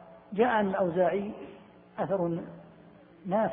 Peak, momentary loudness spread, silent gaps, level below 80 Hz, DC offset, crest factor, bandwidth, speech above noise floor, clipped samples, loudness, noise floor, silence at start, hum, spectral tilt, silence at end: -12 dBFS; 20 LU; none; -66 dBFS; under 0.1%; 18 dB; 3.8 kHz; 26 dB; under 0.1%; -29 LUFS; -54 dBFS; 0 s; none; -10.5 dB/octave; 0 s